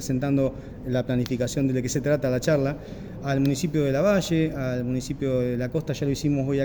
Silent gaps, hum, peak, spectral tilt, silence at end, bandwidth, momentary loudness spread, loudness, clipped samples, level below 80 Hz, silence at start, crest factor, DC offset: none; none; -10 dBFS; -6.5 dB/octave; 0 s; over 20 kHz; 6 LU; -25 LUFS; under 0.1%; -46 dBFS; 0 s; 16 dB; under 0.1%